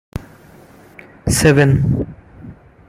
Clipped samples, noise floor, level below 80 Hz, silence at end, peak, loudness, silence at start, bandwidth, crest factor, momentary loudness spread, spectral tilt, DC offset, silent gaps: under 0.1%; -43 dBFS; -36 dBFS; 0.35 s; 0 dBFS; -15 LUFS; 0.15 s; 15.5 kHz; 18 dB; 21 LU; -5.5 dB/octave; under 0.1%; none